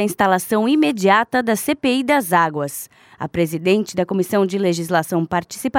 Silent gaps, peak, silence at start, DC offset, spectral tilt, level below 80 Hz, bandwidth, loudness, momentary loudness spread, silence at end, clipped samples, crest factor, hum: none; -2 dBFS; 0 s; under 0.1%; -5 dB/octave; -56 dBFS; over 20 kHz; -18 LUFS; 9 LU; 0 s; under 0.1%; 16 dB; none